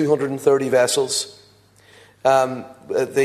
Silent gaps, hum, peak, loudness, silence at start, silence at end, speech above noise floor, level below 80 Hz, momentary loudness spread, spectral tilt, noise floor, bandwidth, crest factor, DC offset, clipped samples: none; none; -2 dBFS; -19 LUFS; 0 s; 0 s; 33 dB; -66 dBFS; 9 LU; -3.5 dB/octave; -52 dBFS; 14 kHz; 18 dB; under 0.1%; under 0.1%